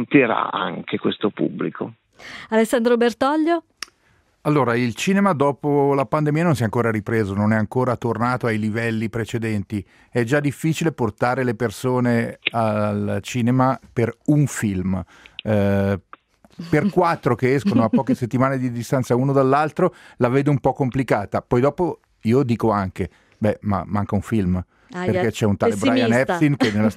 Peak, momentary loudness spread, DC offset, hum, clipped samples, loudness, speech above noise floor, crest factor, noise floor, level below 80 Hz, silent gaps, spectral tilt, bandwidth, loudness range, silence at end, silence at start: -2 dBFS; 8 LU; under 0.1%; none; under 0.1%; -21 LUFS; 41 dB; 20 dB; -61 dBFS; -54 dBFS; none; -7 dB/octave; 15.5 kHz; 3 LU; 0 s; 0 s